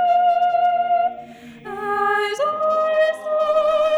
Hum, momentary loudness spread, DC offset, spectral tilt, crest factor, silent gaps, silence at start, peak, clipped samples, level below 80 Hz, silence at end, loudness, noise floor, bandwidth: none; 10 LU; under 0.1%; -3 dB/octave; 12 dB; none; 0 s; -8 dBFS; under 0.1%; -60 dBFS; 0 s; -19 LUFS; -39 dBFS; 11.5 kHz